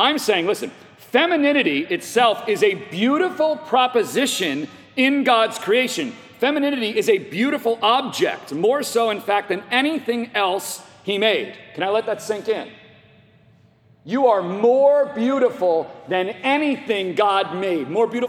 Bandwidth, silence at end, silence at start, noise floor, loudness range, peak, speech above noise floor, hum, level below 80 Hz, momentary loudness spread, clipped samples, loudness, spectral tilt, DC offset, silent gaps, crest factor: 18 kHz; 0 s; 0 s; -54 dBFS; 4 LU; -2 dBFS; 34 dB; none; -74 dBFS; 8 LU; under 0.1%; -20 LUFS; -3.5 dB/octave; under 0.1%; none; 18 dB